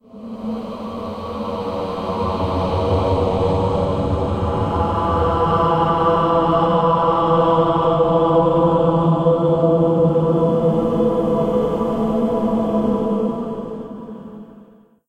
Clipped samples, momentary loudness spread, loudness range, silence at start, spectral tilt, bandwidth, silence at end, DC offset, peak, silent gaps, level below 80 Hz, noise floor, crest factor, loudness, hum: under 0.1%; 12 LU; 5 LU; 0.15 s; -9 dB/octave; 9 kHz; 0.45 s; under 0.1%; -4 dBFS; none; -36 dBFS; -47 dBFS; 14 dB; -18 LUFS; none